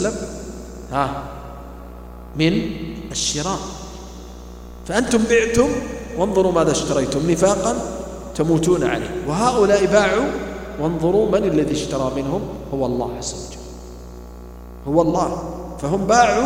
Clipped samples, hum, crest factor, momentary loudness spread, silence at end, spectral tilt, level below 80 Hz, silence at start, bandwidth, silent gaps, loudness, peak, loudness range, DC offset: under 0.1%; 60 Hz at -35 dBFS; 20 dB; 21 LU; 0 s; -5 dB/octave; -38 dBFS; 0 s; 16 kHz; none; -20 LUFS; 0 dBFS; 6 LU; under 0.1%